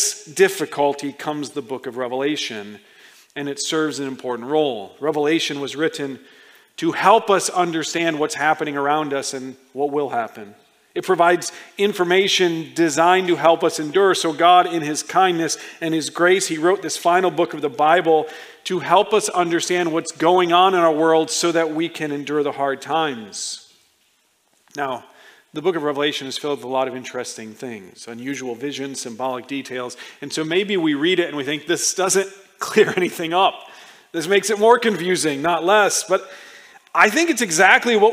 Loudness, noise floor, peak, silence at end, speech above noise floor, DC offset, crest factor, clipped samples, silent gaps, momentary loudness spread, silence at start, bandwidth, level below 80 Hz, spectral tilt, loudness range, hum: -19 LUFS; -63 dBFS; 0 dBFS; 0 s; 43 dB; under 0.1%; 20 dB; under 0.1%; none; 14 LU; 0 s; 16 kHz; -74 dBFS; -3 dB/octave; 8 LU; none